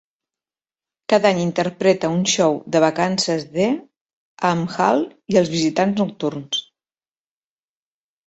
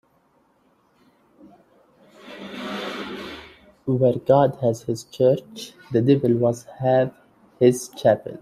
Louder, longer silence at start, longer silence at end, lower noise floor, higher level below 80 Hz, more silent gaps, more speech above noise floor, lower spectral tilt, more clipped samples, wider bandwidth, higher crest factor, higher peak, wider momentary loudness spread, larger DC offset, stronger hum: about the same, -19 LUFS vs -21 LUFS; second, 1.1 s vs 2.25 s; first, 1.65 s vs 0 s; first, under -90 dBFS vs -62 dBFS; about the same, -60 dBFS vs -62 dBFS; first, 3.97-4.06 s, 4.13-4.37 s vs none; first, over 71 dB vs 42 dB; second, -4.5 dB/octave vs -7 dB/octave; neither; second, 8.4 kHz vs 15 kHz; about the same, 18 dB vs 20 dB; about the same, -2 dBFS vs -4 dBFS; second, 7 LU vs 19 LU; neither; neither